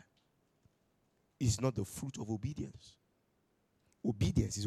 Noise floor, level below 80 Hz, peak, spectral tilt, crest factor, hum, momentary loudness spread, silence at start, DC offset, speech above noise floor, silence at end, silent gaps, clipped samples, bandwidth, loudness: -77 dBFS; -54 dBFS; -18 dBFS; -6 dB/octave; 22 dB; none; 10 LU; 1.4 s; under 0.1%; 41 dB; 0 s; none; under 0.1%; 14.5 kHz; -37 LUFS